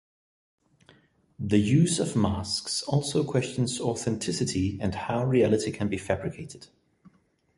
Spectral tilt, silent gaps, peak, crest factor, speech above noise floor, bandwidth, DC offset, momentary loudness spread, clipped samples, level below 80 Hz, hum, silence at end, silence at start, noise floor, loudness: -5.5 dB/octave; none; -10 dBFS; 18 dB; 35 dB; 11.5 kHz; under 0.1%; 9 LU; under 0.1%; -50 dBFS; none; 0.9 s; 1.4 s; -62 dBFS; -27 LUFS